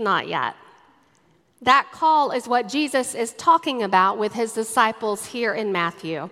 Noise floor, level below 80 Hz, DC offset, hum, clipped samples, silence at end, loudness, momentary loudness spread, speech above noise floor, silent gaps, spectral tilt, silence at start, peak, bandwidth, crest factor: -61 dBFS; -70 dBFS; under 0.1%; none; under 0.1%; 0 s; -21 LUFS; 8 LU; 39 dB; none; -3 dB/octave; 0 s; -2 dBFS; 15.5 kHz; 20 dB